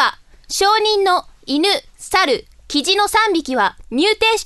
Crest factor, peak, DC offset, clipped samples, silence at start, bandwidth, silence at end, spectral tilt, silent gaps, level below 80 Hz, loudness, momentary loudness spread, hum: 16 dB; -2 dBFS; under 0.1%; under 0.1%; 0 s; 12.5 kHz; 0 s; -1.5 dB/octave; none; -46 dBFS; -16 LUFS; 7 LU; none